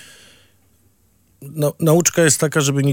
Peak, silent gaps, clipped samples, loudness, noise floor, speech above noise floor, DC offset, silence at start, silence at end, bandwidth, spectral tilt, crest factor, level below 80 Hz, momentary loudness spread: 0 dBFS; none; under 0.1%; -16 LUFS; -58 dBFS; 42 dB; under 0.1%; 1.4 s; 0 s; 17 kHz; -4.5 dB/octave; 18 dB; -62 dBFS; 9 LU